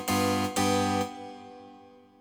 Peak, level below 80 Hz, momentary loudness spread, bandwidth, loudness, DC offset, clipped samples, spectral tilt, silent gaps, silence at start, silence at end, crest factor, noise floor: -14 dBFS; -64 dBFS; 21 LU; over 20 kHz; -27 LUFS; under 0.1%; under 0.1%; -4 dB/octave; none; 0 s; 0.3 s; 16 dB; -53 dBFS